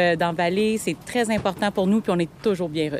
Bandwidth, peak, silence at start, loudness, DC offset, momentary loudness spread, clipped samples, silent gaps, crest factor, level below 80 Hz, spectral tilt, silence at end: 15.5 kHz; -8 dBFS; 0 s; -23 LUFS; under 0.1%; 4 LU; under 0.1%; none; 14 dB; -52 dBFS; -5.5 dB/octave; 0 s